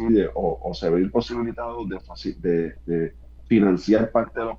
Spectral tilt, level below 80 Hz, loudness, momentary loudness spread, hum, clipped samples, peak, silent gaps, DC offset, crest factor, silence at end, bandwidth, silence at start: -8 dB/octave; -42 dBFS; -23 LUFS; 12 LU; none; under 0.1%; -6 dBFS; none; under 0.1%; 16 dB; 0 s; 7.4 kHz; 0 s